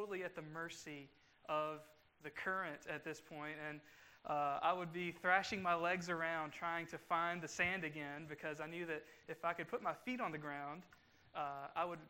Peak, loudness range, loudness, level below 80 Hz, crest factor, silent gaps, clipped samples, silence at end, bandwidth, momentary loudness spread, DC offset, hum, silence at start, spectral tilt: -20 dBFS; 7 LU; -42 LUFS; -78 dBFS; 24 dB; none; under 0.1%; 0 s; 16 kHz; 13 LU; under 0.1%; none; 0 s; -4.5 dB/octave